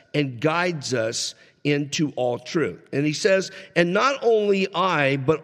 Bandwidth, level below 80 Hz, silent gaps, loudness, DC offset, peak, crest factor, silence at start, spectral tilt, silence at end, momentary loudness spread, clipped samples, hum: 14 kHz; -66 dBFS; none; -23 LUFS; under 0.1%; -4 dBFS; 18 dB; 0.15 s; -4.5 dB/octave; 0 s; 6 LU; under 0.1%; none